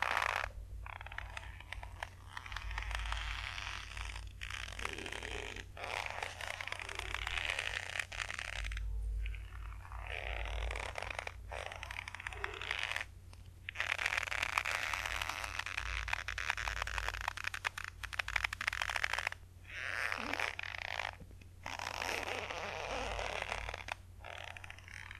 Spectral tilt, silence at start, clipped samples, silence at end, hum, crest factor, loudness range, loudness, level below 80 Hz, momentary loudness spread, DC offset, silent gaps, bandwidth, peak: -2.5 dB/octave; 0 s; under 0.1%; 0 s; none; 28 dB; 6 LU; -40 LUFS; -48 dBFS; 12 LU; under 0.1%; none; 13 kHz; -12 dBFS